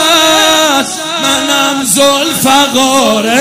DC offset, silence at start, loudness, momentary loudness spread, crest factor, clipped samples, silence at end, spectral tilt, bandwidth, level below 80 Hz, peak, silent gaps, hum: under 0.1%; 0 s; -8 LUFS; 5 LU; 10 dB; 0.4%; 0 s; -1.5 dB/octave; 16.5 kHz; -48 dBFS; 0 dBFS; none; none